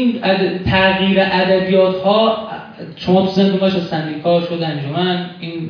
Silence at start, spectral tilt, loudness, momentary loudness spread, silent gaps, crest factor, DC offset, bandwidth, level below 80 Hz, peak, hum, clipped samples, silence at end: 0 s; -7.5 dB/octave; -15 LUFS; 12 LU; none; 16 dB; under 0.1%; 5.4 kHz; -44 dBFS; 0 dBFS; none; under 0.1%; 0 s